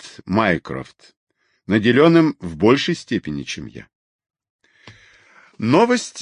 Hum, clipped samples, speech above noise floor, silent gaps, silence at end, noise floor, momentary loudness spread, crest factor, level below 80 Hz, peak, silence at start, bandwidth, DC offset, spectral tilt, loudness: none; under 0.1%; 33 dB; 1.17-1.27 s, 3.95-4.19 s, 4.50-4.59 s; 0 s; -51 dBFS; 17 LU; 18 dB; -50 dBFS; -2 dBFS; 0.05 s; 10.5 kHz; under 0.1%; -6 dB/octave; -18 LUFS